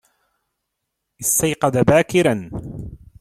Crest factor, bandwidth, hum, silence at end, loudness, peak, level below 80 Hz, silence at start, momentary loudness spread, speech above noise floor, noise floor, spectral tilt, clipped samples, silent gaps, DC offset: 18 dB; 16.5 kHz; none; 0.25 s; -17 LUFS; -2 dBFS; -46 dBFS; 1.2 s; 19 LU; 61 dB; -78 dBFS; -4.5 dB/octave; under 0.1%; none; under 0.1%